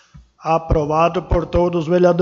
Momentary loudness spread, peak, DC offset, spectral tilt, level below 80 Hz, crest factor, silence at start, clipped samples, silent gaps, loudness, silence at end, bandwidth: 5 LU; -2 dBFS; under 0.1%; -8 dB/octave; -30 dBFS; 14 dB; 0.15 s; under 0.1%; none; -18 LUFS; 0 s; 7.2 kHz